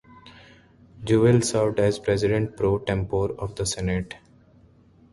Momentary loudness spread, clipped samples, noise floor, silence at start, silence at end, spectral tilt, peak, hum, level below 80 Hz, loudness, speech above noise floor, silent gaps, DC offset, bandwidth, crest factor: 10 LU; under 0.1%; -55 dBFS; 0.25 s; 0.95 s; -6 dB/octave; -6 dBFS; none; -44 dBFS; -23 LUFS; 32 dB; none; under 0.1%; 11.5 kHz; 18 dB